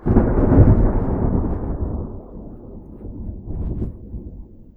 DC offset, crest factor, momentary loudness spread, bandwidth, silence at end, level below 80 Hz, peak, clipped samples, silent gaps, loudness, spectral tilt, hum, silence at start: under 0.1%; 20 dB; 24 LU; 2.6 kHz; 0.15 s; -24 dBFS; 0 dBFS; under 0.1%; none; -19 LUFS; -13.5 dB/octave; none; 0 s